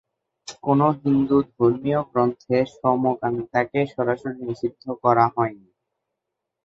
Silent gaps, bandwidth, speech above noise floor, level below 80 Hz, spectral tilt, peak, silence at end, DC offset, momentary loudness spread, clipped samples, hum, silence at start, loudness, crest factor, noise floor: none; 7.8 kHz; 61 dB; -58 dBFS; -8 dB/octave; -2 dBFS; 1.1 s; under 0.1%; 10 LU; under 0.1%; none; 0.45 s; -22 LUFS; 20 dB; -82 dBFS